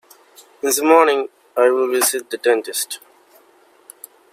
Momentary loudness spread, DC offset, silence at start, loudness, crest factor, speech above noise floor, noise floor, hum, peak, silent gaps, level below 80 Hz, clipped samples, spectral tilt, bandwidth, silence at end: 13 LU; under 0.1%; 0.65 s; -17 LUFS; 18 dB; 36 dB; -53 dBFS; none; 0 dBFS; none; -78 dBFS; under 0.1%; -0.5 dB/octave; 16.5 kHz; 1.35 s